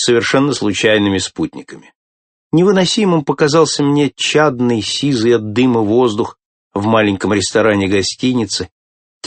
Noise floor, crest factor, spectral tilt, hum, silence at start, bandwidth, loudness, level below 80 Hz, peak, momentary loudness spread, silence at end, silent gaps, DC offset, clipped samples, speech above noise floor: under -90 dBFS; 14 dB; -4.5 dB/octave; none; 0 s; 8.8 kHz; -14 LUFS; -52 dBFS; 0 dBFS; 8 LU; 0 s; 1.95-2.51 s, 6.45-6.71 s, 8.72-9.21 s; under 0.1%; under 0.1%; over 76 dB